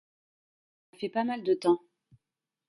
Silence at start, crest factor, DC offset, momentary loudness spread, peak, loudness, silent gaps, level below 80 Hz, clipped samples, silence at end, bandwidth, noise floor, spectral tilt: 1 s; 20 dB; under 0.1%; 8 LU; -12 dBFS; -30 LUFS; none; -72 dBFS; under 0.1%; 0.9 s; 11.5 kHz; -89 dBFS; -6 dB/octave